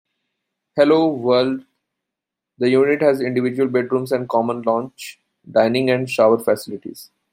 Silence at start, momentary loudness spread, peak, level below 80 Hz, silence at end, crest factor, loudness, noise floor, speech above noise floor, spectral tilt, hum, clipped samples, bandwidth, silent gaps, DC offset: 0.75 s; 15 LU; -2 dBFS; -68 dBFS; 0.25 s; 18 dB; -18 LUFS; -84 dBFS; 66 dB; -6 dB/octave; none; under 0.1%; 16 kHz; none; under 0.1%